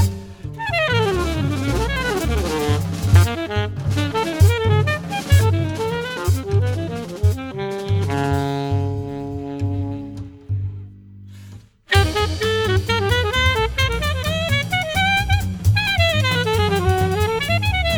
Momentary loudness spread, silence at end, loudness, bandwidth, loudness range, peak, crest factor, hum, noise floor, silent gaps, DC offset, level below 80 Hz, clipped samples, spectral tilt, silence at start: 10 LU; 0 s; -20 LUFS; over 20 kHz; 6 LU; -2 dBFS; 18 dB; none; -41 dBFS; none; under 0.1%; -32 dBFS; under 0.1%; -5.5 dB/octave; 0 s